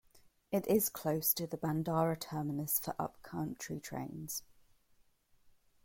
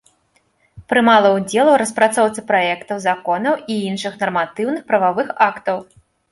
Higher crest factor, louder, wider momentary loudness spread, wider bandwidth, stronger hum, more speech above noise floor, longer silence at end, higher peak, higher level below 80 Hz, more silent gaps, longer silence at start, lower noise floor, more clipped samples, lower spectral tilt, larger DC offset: about the same, 20 dB vs 16 dB; second, -36 LUFS vs -17 LUFS; about the same, 10 LU vs 10 LU; first, 16.5 kHz vs 12 kHz; neither; second, 34 dB vs 45 dB; second, 0.35 s vs 0.5 s; second, -18 dBFS vs -2 dBFS; second, -68 dBFS vs -60 dBFS; neither; second, 0.15 s vs 0.75 s; first, -70 dBFS vs -61 dBFS; neither; about the same, -5 dB/octave vs -4 dB/octave; neither